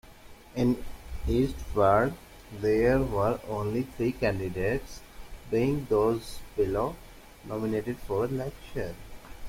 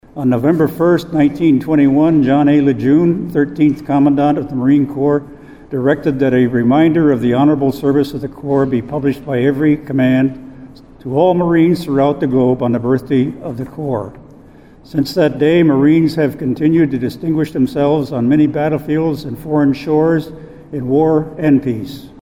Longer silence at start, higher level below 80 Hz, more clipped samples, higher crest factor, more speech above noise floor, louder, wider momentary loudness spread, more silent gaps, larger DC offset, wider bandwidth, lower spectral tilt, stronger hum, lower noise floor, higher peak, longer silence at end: about the same, 0.05 s vs 0.15 s; about the same, -42 dBFS vs -44 dBFS; neither; first, 20 dB vs 12 dB; second, 22 dB vs 27 dB; second, -29 LUFS vs -14 LUFS; first, 21 LU vs 9 LU; neither; second, under 0.1% vs 0.3%; about the same, 16.5 kHz vs 15 kHz; second, -7 dB/octave vs -8.5 dB/octave; neither; first, -49 dBFS vs -41 dBFS; second, -10 dBFS vs 0 dBFS; second, 0 s vs 0.15 s